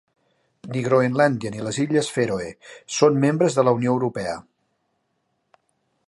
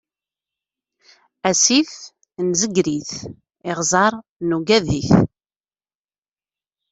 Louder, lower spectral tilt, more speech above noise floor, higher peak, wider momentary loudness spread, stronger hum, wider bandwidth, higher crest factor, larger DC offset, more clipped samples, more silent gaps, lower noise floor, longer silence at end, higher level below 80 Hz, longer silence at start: second, -21 LUFS vs -18 LUFS; first, -5.5 dB/octave vs -3.5 dB/octave; second, 52 dB vs over 72 dB; about the same, -2 dBFS vs 0 dBFS; second, 12 LU vs 17 LU; second, none vs 50 Hz at -45 dBFS; first, 11.5 kHz vs 8.4 kHz; about the same, 20 dB vs 20 dB; neither; neither; second, none vs 4.29-4.36 s; second, -72 dBFS vs under -90 dBFS; about the same, 1.65 s vs 1.65 s; second, -60 dBFS vs -48 dBFS; second, 0.65 s vs 1.45 s